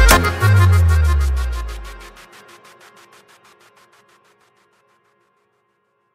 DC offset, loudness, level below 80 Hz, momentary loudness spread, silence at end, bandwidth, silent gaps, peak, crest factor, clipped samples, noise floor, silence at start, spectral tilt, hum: under 0.1%; -15 LUFS; -24 dBFS; 24 LU; 4.05 s; 16 kHz; none; 0 dBFS; 18 dB; under 0.1%; -66 dBFS; 0 s; -4.5 dB/octave; none